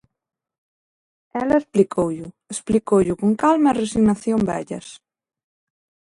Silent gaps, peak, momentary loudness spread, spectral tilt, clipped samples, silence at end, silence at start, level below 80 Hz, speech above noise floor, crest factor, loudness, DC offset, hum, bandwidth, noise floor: none; -4 dBFS; 14 LU; -6.5 dB/octave; under 0.1%; 1.2 s; 1.35 s; -50 dBFS; over 71 dB; 18 dB; -19 LUFS; under 0.1%; none; 11.5 kHz; under -90 dBFS